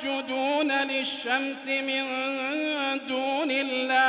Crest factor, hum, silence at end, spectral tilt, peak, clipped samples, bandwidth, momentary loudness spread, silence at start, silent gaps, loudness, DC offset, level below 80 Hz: 16 dB; none; 0 s; 1.5 dB/octave; -12 dBFS; under 0.1%; 4 kHz; 4 LU; 0 s; none; -27 LUFS; under 0.1%; -78 dBFS